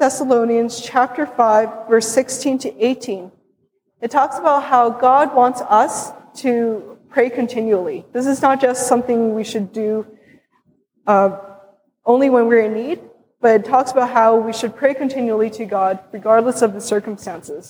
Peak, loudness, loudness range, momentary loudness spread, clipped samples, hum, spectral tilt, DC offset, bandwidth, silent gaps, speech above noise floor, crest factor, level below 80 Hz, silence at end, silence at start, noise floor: -2 dBFS; -17 LUFS; 3 LU; 11 LU; under 0.1%; none; -4.5 dB/octave; under 0.1%; 19.5 kHz; none; 49 dB; 16 dB; -66 dBFS; 0.1 s; 0 s; -65 dBFS